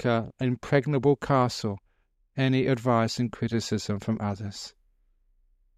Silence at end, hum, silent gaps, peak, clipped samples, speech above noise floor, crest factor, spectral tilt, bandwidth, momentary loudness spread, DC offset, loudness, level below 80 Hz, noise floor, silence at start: 1.1 s; none; none; -8 dBFS; under 0.1%; 43 dB; 20 dB; -6.5 dB/octave; 13 kHz; 13 LU; under 0.1%; -27 LUFS; -58 dBFS; -69 dBFS; 0 s